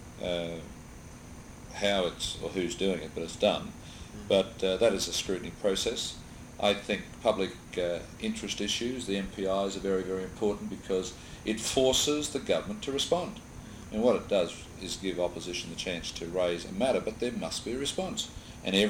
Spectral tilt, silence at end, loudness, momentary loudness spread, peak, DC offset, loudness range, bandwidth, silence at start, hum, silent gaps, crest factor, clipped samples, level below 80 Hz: -3.5 dB/octave; 0 s; -31 LUFS; 15 LU; -10 dBFS; under 0.1%; 3 LU; 17 kHz; 0 s; none; none; 22 dB; under 0.1%; -52 dBFS